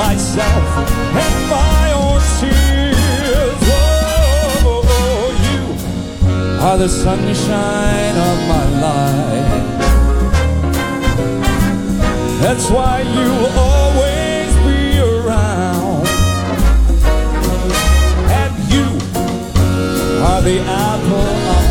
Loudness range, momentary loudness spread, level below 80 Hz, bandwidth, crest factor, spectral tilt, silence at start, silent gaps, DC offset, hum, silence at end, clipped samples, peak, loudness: 2 LU; 4 LU; -16 dBFS; 17.5 kHz; 10 dB; -5.5 dB/octave; 0 s; none; under 0.1%; none; 0 s; under 0.1%; -2 dBFS; -14 LUFS